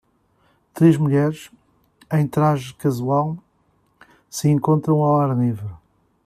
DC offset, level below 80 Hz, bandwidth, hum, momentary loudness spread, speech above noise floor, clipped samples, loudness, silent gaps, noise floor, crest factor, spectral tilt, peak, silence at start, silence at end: under 0.1%; -58 dBFS; 14.5 kHz; none; 14 LU; 45 dB; under 0.1%; -19 LUFS; none; -63 dBFS; 18 dB; -8 dB/octave; -4 dBFS; 0.75 s; 0.5 s